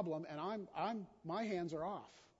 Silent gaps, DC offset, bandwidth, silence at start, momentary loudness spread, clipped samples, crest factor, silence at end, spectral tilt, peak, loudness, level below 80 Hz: none; under 0.1%; 7.6 kHz; 0 s; 5 LU; under 0.1%; 16 dB; 0.15 s; -5 dB/octave; -28 dBFS; -44 LUFS; -78 dBFS